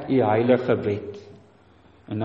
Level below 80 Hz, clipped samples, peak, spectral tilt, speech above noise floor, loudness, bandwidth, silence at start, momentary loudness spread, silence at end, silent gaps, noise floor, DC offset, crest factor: -60 dBFS; under 0.1%; -6 dBFS; -9 dB/octave; 33 dB; -22 LUFS; 6.8 kHz; 0 s; 18 LU; 0 s; none; -54 dBFS; under 0.1%; 18 dB